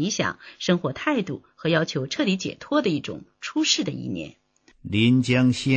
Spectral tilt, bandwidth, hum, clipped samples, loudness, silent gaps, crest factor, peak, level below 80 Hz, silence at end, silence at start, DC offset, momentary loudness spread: -5 dB/octave; 9 kHz; none; under 0.1%; -24 LUFS; none; 18 dB; -6 dBFS; -58 dBFS; 0 s; 0 s; under 0.1%; 14 LU